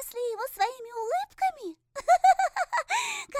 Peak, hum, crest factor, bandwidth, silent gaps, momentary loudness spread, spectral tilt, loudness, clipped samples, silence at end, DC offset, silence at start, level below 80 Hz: -10 dBFS; none; 18 dB; 16 kHz; none; 13 LU; 0 dB/octave; -27 LUFS; under 0.1%; 0 s; under 0.1%; 0 s; -66 dBFS